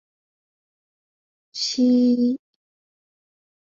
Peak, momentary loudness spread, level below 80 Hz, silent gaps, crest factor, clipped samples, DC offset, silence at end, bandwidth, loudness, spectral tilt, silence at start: -10 dBFS; 14 LU; -74 dBFS; none; 14 dB; under 0.1%; under 0.1%; 1.3 s; 7.4 kHz; -20 LUFS; -4 dB/octave; 1.55 s